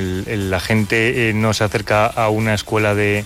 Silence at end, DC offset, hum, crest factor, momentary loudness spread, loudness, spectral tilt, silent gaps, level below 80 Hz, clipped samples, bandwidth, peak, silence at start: 0 s; under 0.1%; none; 12 dB; 5 LU; -17 LUFS; -5.5 dB/octave; none; -42 dBFS; under 0.1%; 16 kHz; -4 dBFS; 0 s